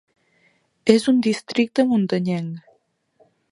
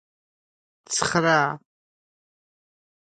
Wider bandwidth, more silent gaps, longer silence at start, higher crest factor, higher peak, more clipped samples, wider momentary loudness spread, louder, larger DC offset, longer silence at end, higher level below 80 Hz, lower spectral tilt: first, 11 kHz vs 9.6 kHz; neither; about the same, 0.85 s vs 0.9 s; about the same, 22 dB vs 24 dB; first, 0 dBFS vs -4 dBFS; neither; about the same, 11 LU vs 9 LU; about the same, -20 LUFS vs -22 LUFS; neither; second, 0.95 s vs 1.5 s; about the same, -66 dBFS vs -62 dBFS; first, -6 dB/octave vs -3.5 dB/octave